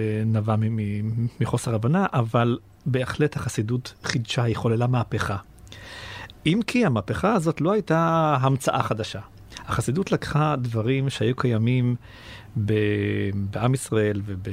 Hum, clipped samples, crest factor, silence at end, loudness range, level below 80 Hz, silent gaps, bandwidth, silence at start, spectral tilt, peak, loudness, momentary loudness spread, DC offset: none; under 0.1%; 20 dB; 0 s; 3 LU; -50 dBFS; none; 14.5 kHz; 0 s; -6.5 dB/octave; -2 dBFS; -24 LUFS; 11 LU; under 0.1%